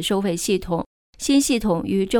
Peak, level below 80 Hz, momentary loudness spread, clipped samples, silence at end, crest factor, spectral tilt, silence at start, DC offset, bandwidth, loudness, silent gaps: -6 dBFS; -42 dBFS; 10 LU; under 0.1%; 0 s; 16 dB; -4.5 dB/octave; 0 s; under 0.1%; 18.5 kHz; -21 LUFS; 0.86-1.13 s